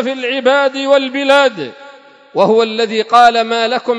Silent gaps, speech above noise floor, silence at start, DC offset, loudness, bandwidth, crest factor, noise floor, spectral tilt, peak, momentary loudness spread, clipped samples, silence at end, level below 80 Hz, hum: none; 27 dB; 0 s; under 0.1%; -12 LUFS; 11 kHz; 12 dB; -39 dBFS; -4 dB/octave; 0 dBFS; 8 LU; 0.3%; 0 s; -62 dBFS; none